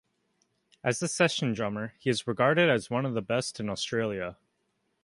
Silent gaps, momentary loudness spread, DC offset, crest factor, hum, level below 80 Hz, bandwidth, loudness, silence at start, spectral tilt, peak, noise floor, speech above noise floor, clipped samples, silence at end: none; 9 LU; under 0.1%; 20 dB; none; -64 dBFS; 11.5 kHz; -28 LUFS; 0.85 s; -4.5 dB/octave; -10 dBFS; -76 dBFS; 48 dB; under 0.1%; 0.7 s